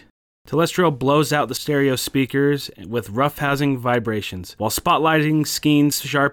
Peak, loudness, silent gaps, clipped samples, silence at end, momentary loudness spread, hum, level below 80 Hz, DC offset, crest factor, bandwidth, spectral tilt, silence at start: -6 dBFS; -20 LUFS; none; under 0.1%; 0 s; 9 LU; none; -50 dBFS; under 0.1%; 14 dB; 19 kHz; -5 dB/octave; 0.45 s